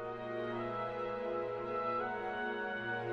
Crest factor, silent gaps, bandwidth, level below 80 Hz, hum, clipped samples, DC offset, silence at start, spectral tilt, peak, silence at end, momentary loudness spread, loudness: 12 dB; none; 7.2 kHz; -68 dBFS; none; under 0.1%; under 0.1%; 0 s; -7 dB/octave; -26 dBFS; 0 s; 3 LU; -38 LUFS